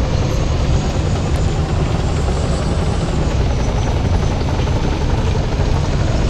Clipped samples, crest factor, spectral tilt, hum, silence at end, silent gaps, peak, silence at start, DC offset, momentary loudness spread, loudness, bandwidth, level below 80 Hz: under 0.1%; 12 dB; -6.5 dB/octave; none; 0 s; none; -2 dBFS; 0 s; under 0.1%; 1 LU; -18 LUFS; 10.5 kHz; -20 dBFS